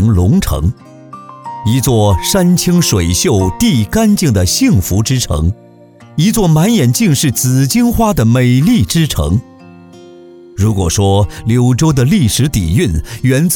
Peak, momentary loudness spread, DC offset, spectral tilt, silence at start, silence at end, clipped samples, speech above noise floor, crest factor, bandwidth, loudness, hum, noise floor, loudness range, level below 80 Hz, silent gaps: 0 dBFS; 6 LU; under 0.1%; -5.5 dB/octave; 0 s; 0 s; under 0.1%; 28 dB; 10 dB; 20 kHz; -12 LUFS; none; -39 dBFS; 3 LU; -26 dBFS; none